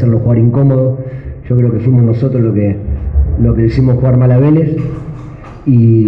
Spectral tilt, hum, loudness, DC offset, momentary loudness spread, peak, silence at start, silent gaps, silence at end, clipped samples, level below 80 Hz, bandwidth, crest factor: -12 dB/octave; none; -11 LUFS; under 0.1%; 14 LU; 0 dBFS; 0 s; none; 0 s; under 0.1%; -22 dBFS; 5.2 kHz; 10 dB